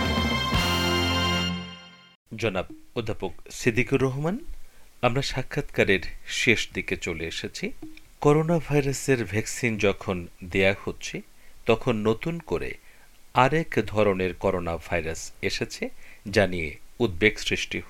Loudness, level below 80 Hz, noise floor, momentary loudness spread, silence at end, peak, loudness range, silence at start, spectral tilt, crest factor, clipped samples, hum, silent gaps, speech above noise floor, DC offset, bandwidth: -26 LUFS; -42 dBFS; -49 dBFS; 12 LU; 0 s; -2 dBFS; 3 LU; 0 s; -5 dB/octave; 24 dB; under 0.1%; none; 2.15-2.26 s; 23 dB; under 0.1%; 17 kHz